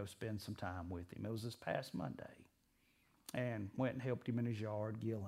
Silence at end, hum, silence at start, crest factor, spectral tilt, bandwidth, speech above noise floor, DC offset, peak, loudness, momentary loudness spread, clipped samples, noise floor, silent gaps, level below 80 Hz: 0 s; none; 0 s; 20 dB; -7 dB/octave; 16 kHz; 33 dB; under 0.1%; -24 dBFS; -44 LUFS; 7 LU; under 0.1%; -77 dBFS; none; -72 dBFS